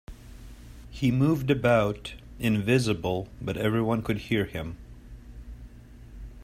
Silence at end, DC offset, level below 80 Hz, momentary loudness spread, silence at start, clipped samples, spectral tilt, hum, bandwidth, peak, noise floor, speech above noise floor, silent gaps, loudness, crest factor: 0 s; under 0.1%; -46 dBFS; 24 LU; 0.1 s; under 0.1%; -6.5 dB/octave; none; 16 kHz; -10 dBFS; -47 dBFS; 21 dB; none; -26 LUFS; 18 dB